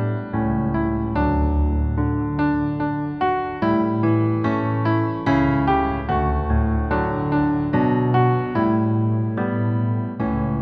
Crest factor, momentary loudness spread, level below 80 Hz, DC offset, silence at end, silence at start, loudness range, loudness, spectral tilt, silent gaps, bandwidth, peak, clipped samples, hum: 14 dB; 4 LU; -30 dBFS; under 0.1%; 0 s; 0 s; 1 LU; -21 LUFS; -10.5 dB/octave; none; 5.2 kHz; -6 dBFS; under 0.1%; none